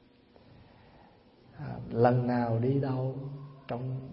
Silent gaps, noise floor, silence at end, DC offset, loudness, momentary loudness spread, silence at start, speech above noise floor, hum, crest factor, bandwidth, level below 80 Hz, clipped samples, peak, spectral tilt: none; -59 dBFS; 0 s; under 0.1%; -30 LUFS; 17 LU; 0.6 s; 31 dB; none; 22 dB; 5.6 kHz; -62 dBFS; under 0.1%; -10 dBFS; -12 dB/octave